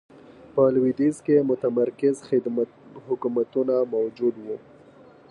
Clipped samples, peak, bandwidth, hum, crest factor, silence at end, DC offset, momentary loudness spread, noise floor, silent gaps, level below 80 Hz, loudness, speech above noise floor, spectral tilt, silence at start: under 0.1%; -8 dBFS; 11 kHz; none; 16 dB; 0.75 s; under 0.1%; 10 LU; -50 dBFS; none; -68 dBFS; -24 LUFS; 27 dB; -8 dB/octave; 0.55 s